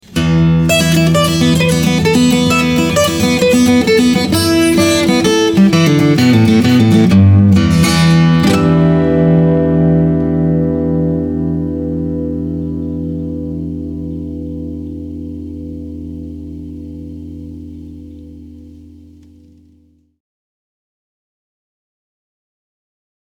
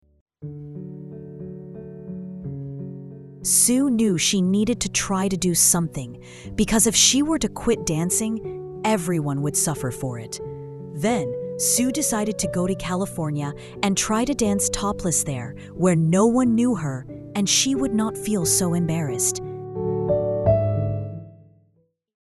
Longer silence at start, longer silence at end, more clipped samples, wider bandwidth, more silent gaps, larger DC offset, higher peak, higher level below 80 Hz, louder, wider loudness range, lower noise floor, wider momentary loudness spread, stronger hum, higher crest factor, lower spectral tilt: second, 0.1 s vs 0.4 s; first, 4.6 s vs 0.85 s; neither; first, 18.5 kHz vs 12.5 kHz; neither; neither; about the same, 0 dBFS vs -2 dBFS; first, -34 dBFS vs -46 dBFS; first, -11 LUFS vs -21 LUFS; first, 19 LU vs 5 LU; second, -51 dBFS vs -65 dBFS; about the same, 18 LU vs 19 LU; neither; second, 12 dB vs 22 dB; first, -6 dB/octave vs -4 dB/octave